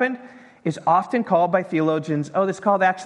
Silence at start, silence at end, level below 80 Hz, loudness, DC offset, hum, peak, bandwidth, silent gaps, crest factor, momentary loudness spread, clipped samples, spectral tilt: 0 s; 0 s; -70 dBFS; -21 LUFS; under 0.1%; none; -4 dBFS; 11 kHz; none; 16 dB; 8 LU; under 0.1%; -7 dB/octave